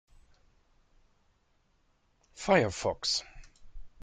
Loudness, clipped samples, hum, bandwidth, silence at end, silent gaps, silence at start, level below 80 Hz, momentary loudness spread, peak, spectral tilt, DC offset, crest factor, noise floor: -29 LUFS; under 0.1%; none; 9.6 kHz; 0.15 s; none; 2.35 s; -56 dBFS; 7 LU; -10 dBFS; -3.5 dB/octave; under 0.1%; 24 dB; -71 dBFS